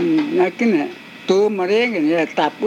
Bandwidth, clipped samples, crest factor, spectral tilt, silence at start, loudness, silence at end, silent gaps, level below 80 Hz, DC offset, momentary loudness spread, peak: 10 kHz; under 0.1%; 14 dB; -5.5 dB/octave; 0 s; -18 LUFS; 0 s; none; -72 dBFS; under 0.1%; 4 LU; -4 dBFS